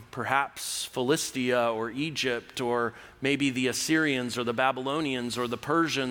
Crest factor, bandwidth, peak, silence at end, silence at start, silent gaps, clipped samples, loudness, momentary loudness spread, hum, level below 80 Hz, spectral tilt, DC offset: 20 dB; over 20 kHz; -8 dBFS; 0 s; 0 s; none; under 0.1%; -28 LUFS; 6 LU; none; -64 dBFS; -3.5 dB/octave; under 0.1%